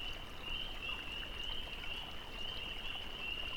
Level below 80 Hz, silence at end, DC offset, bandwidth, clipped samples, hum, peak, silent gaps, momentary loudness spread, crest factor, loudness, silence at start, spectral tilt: -50 dBFS; 0 s; under 0.1%; 19 kHz; under 0.1%; none; -28 dBFS; none; 3 LU; 14 dB; -42 LUFS; 0 s; -3 dB/octave